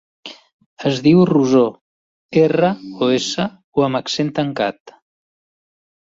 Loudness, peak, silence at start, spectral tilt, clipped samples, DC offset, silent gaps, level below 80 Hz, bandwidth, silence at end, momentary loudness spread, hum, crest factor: -17 LUFS; -2 dBFS; 0.25 s; -6 dB/octave; under 0.1%; under 0.1%; 0.53-0.59 s, 0.66-0.77 s, 1.81-2.29 s, 3.64-3.72 s, 4.80-4.85 s; -58 dBFS; 8 kHz; 1.15 s; 10 LU; none; 16 dB